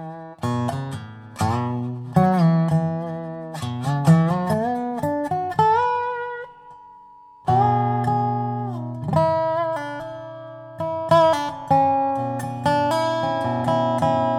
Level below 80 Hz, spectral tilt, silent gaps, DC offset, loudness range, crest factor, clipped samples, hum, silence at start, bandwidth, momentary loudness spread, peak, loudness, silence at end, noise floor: -58 dBFS; -7.5 dB/octave; none; under 0.1%; 3 LU; 18 dB; under 0.1%; none; 0 s; 13.5 kHz; 14 LU; -4 dBFS; -22 LUFS; 0 s; -47 dBFS